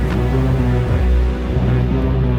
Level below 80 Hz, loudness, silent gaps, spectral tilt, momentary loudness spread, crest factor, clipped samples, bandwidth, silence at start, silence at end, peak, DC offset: -18 dBFS; -17 LUFS; none; -9 dB/octave; 2 LU; 10 dB; under 0.1%; 6.6 kHz; 0 s; 0 s; -6 dBFS; under 0.1%